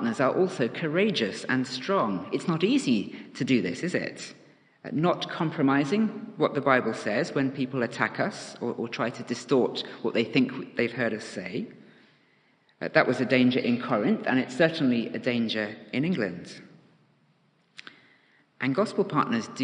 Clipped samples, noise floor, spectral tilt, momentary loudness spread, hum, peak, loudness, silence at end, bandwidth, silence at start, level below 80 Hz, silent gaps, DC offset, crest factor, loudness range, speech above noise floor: under 0.1%; -66 dBFS; -6 dB/octave; 11 LU; none; -4 dBFS; -27 LUFS; 0 s; 10 kHz; 0 s; -74 dBFS; none; under 0.1%; 24 dB; 6 LU; 40 dB